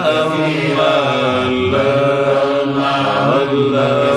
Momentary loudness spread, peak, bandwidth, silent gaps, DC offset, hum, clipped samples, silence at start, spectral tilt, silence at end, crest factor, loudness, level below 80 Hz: 2 LU; -2 dBFS; 12 kHz; none; under 0.1%; none; under 0.1%; 0 s; -6 dB/octave; 0 s; 12 dB; -14 LUFS; -48 dBFS